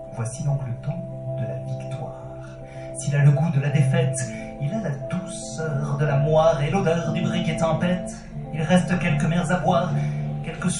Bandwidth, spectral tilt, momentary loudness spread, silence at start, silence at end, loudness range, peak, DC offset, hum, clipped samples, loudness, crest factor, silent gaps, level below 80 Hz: 11.5 kHz; -6.5 dB/octave; 14 LU; 0 s; 0 s; 3 LU; -6 dBFS; under 0.1%; none; under 0.1%; -23 LUFS; 18 dB; none; -44 dBFS